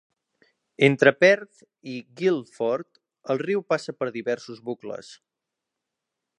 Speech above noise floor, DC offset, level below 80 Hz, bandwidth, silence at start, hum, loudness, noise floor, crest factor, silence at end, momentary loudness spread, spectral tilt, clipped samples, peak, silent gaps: 61 dB; under 0.1%; -78 dBFS; 10 kHz; 0.8 s; none; -23 LUFS; -85 dBFS; 24 dB; 1.25 s; 19 LU; -5.5 dB/octave; under 0.1%; -2 dBFS; none